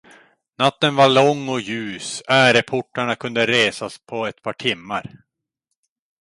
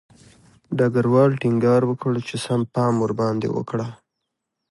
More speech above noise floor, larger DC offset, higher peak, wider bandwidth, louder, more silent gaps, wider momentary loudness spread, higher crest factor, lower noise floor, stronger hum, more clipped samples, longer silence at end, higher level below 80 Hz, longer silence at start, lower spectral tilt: about the same, 60 dB vs 60 dB; neither; about the same, -2 dBFS vs -4 dBFS; about the same, 11.5 kHz vs 11.5 kHz; about the same, -19 LUFS vs -21 LUFS; neither; first, 14 LU vs 10 LU; about the same, 18 dB vs 18 dB; about the same, -79 dBFS vs -80 dBFS; neither; neither; first, 1.05 s vs 0.75 s; about the same, -62 dBFS vs -60 dBFS; about the same, 0.6 s vs 0.7 s; second, -4 dB/octave vs -7.5 dB/octave